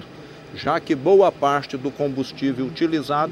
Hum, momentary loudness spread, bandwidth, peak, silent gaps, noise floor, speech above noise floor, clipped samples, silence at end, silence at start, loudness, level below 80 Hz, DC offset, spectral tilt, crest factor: none; 14 LU; 13 kHz; -4 dBFS; none; -40 dBFS; 20 dB; under 0.1%; 0 s; 0 s; -21 LUFS; -58 dBFS; under 0.1%; -6.5 dB/octave; 16 dB